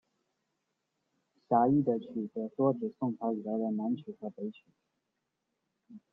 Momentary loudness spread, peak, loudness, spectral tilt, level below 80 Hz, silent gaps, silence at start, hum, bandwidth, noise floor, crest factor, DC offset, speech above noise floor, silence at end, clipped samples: 14 LU; -14 dBFS; -32 LUFS; -11 dB/octave; -76 dBFS; none; 1.5 s; none; 3.9 kHz; -84 dBFS; 22 dB; under 0.1%; 52 dB; 0.15 s; under 0.1%